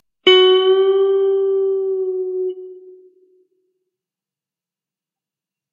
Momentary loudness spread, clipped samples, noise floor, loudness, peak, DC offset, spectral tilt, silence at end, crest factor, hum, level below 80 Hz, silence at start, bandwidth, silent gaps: 13 LU; under 0.1%; -90 dBFS; -15 LUFS; 0 dBFS; under 0.1%; 1 dB/octave; 2.8 s; 18 dB; none; -78 dBFS; 0.25 s; 7 kHz; none